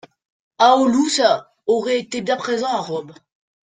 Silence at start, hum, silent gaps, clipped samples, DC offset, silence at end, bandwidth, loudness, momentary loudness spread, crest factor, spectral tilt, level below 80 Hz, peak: 0.6 s; none; none; under 0.1%; under 0.1%; 0.5 s; 9.6 kHz; -18 LUFS; 9 LU; 18 dB; -3.5 dB/octave; -64 dBFS; -2 dBFS